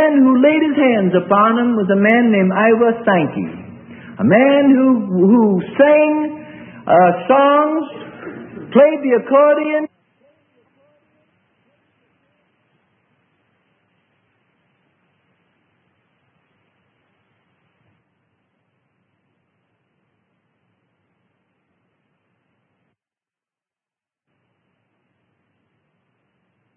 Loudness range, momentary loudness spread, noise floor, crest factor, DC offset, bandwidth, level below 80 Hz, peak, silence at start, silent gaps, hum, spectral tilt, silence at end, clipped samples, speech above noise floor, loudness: 4 LU; 21 LU; under -90 dBFS; 18 dB; under 0.1%; 3.5 kHz; -66 dBFS; 0 dBFS; 0 s; none; none; -10.5 dB/octave; 16.9 s; under 0.1%; over 77 dB; -14 LUFS